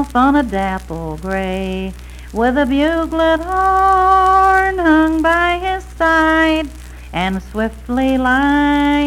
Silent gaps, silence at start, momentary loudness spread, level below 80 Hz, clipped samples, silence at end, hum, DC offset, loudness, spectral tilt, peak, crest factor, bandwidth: none; 0 s; 13 LU; -30 dBFS; under 0.1%; 0 s; none; under 0.1%; -15 LUFS; -5.5 dB/octave; -2 dBFS; 14 dB; 15.5 kHz